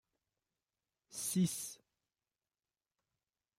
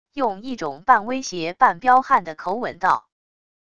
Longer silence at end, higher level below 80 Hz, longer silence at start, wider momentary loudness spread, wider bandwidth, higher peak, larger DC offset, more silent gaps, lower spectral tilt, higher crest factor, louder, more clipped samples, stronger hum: first, 1.85 s vs 0.8 s; second, -82 dBFS vs -60 dBFS; first, 1.1 s vs 0.15 s; first, 16 LU vs 11 LU; first, 16 kHz vs 8.2 kHz; second, -24 dBFS vs -2 dBFS; second, under 0.1% vs 0.5%; neither; about the same, -4.5 dB/octave vs -4 dB/octave; about the same, 20 dB vs 20 dB; second, -38 LUFS vs -20 LUFS; neither; neither